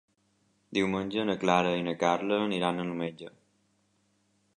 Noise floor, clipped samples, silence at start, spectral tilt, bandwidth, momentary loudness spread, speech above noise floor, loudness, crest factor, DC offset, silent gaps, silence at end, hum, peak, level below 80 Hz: -71 dBFS; under 0.1%; 0.7 s; -5.5 dB/octave; 10.5 kHz; 10 LU; 43 dB; -29 LUFS; 22 dB; under 0.1%; none; 1.3 s; none; -8 dBFS; -66 dBFS